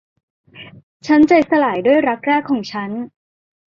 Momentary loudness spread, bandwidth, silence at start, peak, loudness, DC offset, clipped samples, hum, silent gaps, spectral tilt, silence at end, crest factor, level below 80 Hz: 16 LU; 7.2 kHz; 0.55 s; -2 dBFS; -15 LUFS; under 0.1%; under 0.1%; none; 0.83-1.00 s; -6 dB/octave; 0.7 s; 16 dB; -58 dBFS